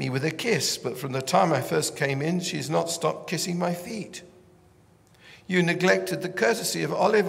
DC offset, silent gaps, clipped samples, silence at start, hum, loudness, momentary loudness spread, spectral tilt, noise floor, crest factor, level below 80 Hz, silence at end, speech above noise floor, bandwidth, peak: under 0.1%; none; under 0.1%; 0 s; none; -25 LUFS; 8 LU; -4 dB/octave; -57 dBFS; 20 dB; -68 dBFS; 0 s; 32 dB; 16 kHz; -6 dBFS